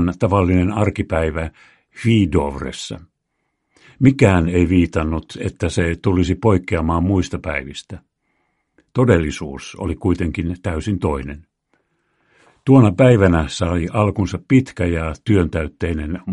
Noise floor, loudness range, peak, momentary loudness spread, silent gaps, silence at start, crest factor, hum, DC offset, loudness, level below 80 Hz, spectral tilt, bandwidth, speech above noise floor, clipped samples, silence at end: -73 dBFS; 6 LU; 0 dBFS; 14 LU; none; 0 s; 18 dB; none; under 0.1%; -18 LUFS; -34 dBFS; -7.5 dB/octave; 11 kHz; 55 dB; under 0.1%; 0 s